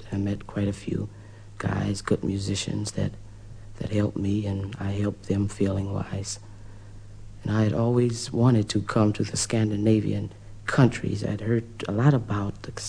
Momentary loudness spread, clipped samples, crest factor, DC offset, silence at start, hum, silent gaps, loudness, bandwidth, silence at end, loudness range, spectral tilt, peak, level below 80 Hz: 21 LU; under 0.1%; 20 dB; under 0.1%; 0 s; none; none; -26 LUFS; 10.5 kHz; 0 s; 6 LU; -6 dB/octave; -6 dBFS; -46 dBFS